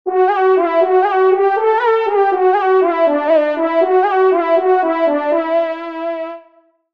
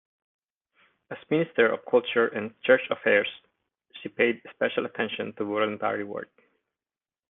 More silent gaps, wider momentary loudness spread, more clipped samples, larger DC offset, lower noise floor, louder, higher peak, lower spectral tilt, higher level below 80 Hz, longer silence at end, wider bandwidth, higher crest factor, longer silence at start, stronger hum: neither; second, 8 LU vs 16 LU; neither; first, 0.2% vs under 0.1%; second, -52 dBFS vs under -90 dBFS; first, -14 LUFS vs -26 LUFS; first, -2 dBFS vs -6 dBFS; first, -5 dB/octave vs -2.5 dB/octave; about the same, -70 dBFS vs -72 dBFS; second, 0.55 s vs 1.05 s; first, 5.2 kHz vs 3.9 kHz; second, 12 dB vs 22 dB; second, 0.05 s vs 1.1 s; neither